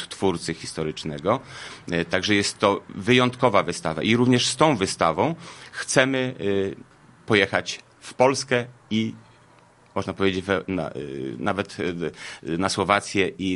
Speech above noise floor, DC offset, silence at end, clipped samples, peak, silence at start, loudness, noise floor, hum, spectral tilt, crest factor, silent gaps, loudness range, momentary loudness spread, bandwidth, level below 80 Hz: 31 dB; under 0.1%; 0 s; under 0.1%; 0 dBFS; 0 s; -23 LUFS; -54 dBFS; none; -4.5 dB/octave; 24 dB; none; 7 LU; 12 LU; 11.5 kHz; -52 dBFS